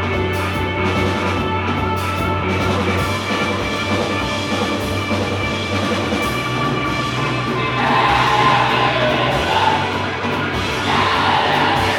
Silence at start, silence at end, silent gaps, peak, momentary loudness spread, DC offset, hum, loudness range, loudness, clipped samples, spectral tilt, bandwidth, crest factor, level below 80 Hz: 0 s; 0 s; none; -2 dBFS; 6 LU; under 0.1%; none; 3 LU; -18 LUFS; under 0.1%; -5 dB/octave; 19 kHz; 16 dB; -38 dBFS